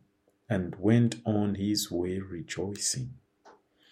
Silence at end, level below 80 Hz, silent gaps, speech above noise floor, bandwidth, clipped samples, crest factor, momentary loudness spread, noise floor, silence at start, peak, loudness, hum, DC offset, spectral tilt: 0.4 s; -62 dBFS; none; 33 dB; 16 kHz; under 0.1%; 20 dB; 11 LU; -62 dBFS; 0.5 s; -10 dBFS; -30 LUFS; none; under 0.1%; -5 dB/octave